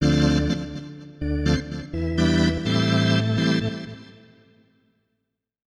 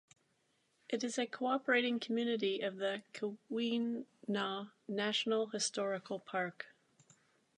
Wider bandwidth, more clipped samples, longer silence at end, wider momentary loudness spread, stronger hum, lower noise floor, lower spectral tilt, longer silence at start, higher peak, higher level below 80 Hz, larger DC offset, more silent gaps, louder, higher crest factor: about the same, 11.5 kHz vs 11 kHz; neither; first, 1.7 s vs 0.9 s; first, 15 LU vs 10 LU; neither; about the same, -78 dBFS vs -77 dBFS; first, -6 dB/octave vs -3.5 dB/octave; second, 0 s vs 0.9 s; first, -6 dBFS vs -20 dBFS; first, -36 dBFS vs under -90 dBFS; neither; neither; first, -22 LUFS vs -37 LUFS; about the same, 18 dB vs 18 dB